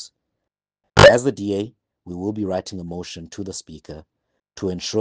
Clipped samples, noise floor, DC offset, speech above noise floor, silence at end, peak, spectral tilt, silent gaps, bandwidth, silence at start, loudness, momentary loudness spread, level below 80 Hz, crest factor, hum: under 0.1%; -82 dBFS; under 0.1%; 56 dB; 0 s; -2 dBFS; -4.5 dB/octave; none; 9.8 kHz; 0 s; -18 LUFS; 26 LU; -42 dBFS; 20 dB; none